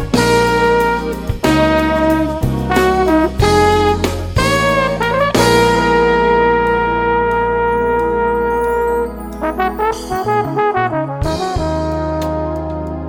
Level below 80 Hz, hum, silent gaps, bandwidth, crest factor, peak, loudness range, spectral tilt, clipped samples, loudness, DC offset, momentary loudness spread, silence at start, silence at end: -28 dBFS; none; none; 17.5 kHz; 14 dB; 0 dBFS; 5 LU; -5.5 dB/octave; under 0.1%; -15 LUFS; under 0.1%; 7 LU; 0 s; 0 s